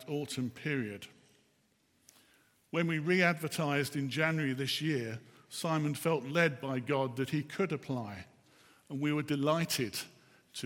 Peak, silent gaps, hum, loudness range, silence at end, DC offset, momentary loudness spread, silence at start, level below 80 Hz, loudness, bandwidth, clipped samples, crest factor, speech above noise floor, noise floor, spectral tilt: -12 dBFS; none; none; 3 LU; 0 s; under 0.1%; 14 LU; 0 s; -78 dBFS; -33 LUFS; 17 kHz; under 0.1%; 22 dB; 39 dB; -72 dBFS; -5 dB/octave